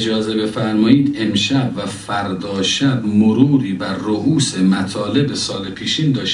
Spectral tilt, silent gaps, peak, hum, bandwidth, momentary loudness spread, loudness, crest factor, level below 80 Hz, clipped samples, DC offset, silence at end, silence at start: -5 dB/octave; none; 0 dBFS; none; 11 kHz; 9 LU; -17 LUFS; 16 dB; -52 dBFS; under 0.1%; under 0.1%; 0 s; 0 s